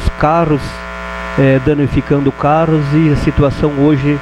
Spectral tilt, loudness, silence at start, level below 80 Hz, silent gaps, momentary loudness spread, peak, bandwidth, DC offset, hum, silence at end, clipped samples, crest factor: -8.5 dB/octave; -13 LUFS; 0 s; -26 dBFS; none; 9 LU; -2 dBFS; 11 kHz; under 0.1%; none; 0 s; under 0.1%; 10 dB